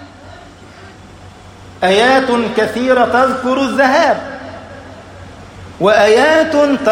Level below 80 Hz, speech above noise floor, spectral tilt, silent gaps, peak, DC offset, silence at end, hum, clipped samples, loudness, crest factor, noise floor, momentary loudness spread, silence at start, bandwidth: -46 dBFS; 25 dB; -4.5 dB/octave; none; 0 dBFS; under 0.1%; 0 s; none; under 0.1%; -12 LUFS; 14 dB; -36 dBFS; 23 LU; 0 s; 16 kHz